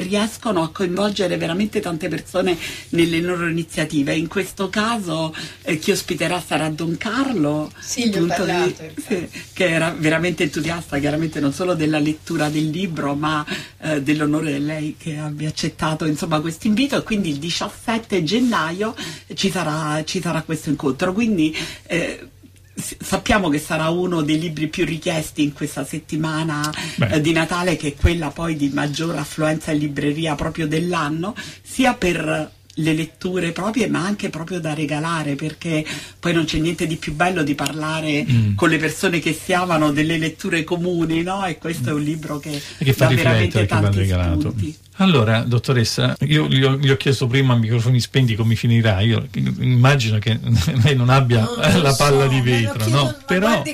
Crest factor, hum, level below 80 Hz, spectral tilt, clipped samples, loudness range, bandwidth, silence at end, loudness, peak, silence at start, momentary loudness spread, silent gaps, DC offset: 18 dB; none; -40 dBFS; -5.5 dB/octave; under 0.1%; 5 LU; 15.5 kHz; 0 s; -20 LUFS; 0 dBFS; 0 s; 9 LU; none; under 0.1%